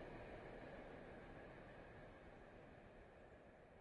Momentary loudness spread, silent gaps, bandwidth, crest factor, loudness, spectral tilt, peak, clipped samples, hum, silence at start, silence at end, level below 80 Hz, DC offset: 8 LU; none; 10.5 kHz; 14 dB; -60 LUFS; -7 dB/octave; -44 dBFS; under 0.1%; none; 0 s; 0 s; -68 dBFS; under 0.1%